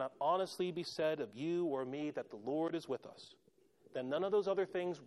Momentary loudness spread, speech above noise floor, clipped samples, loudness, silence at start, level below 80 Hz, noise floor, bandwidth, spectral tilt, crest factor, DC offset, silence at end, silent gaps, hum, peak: 10 LU; 30 dB; under 0.1%; -39 LUFS; 0 s; -86 dBFS; -68 dBFS; 12.5 kHz; -6 dB/octave; 16 dB; under 0.1%; 0 s; none; none; -22 dBFS